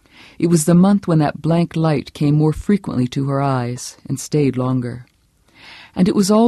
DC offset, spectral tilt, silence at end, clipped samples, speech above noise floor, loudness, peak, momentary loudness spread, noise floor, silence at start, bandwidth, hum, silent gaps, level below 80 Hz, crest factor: under 0.1%; -7 dB/octave; 0 s; under 0.1%; 39 dB; -17 LUFS; -2 dBFS; 13 LU; -55 dBFS; 0.4 s; 13 kHz; none; none; -46 dBFS; 16 dB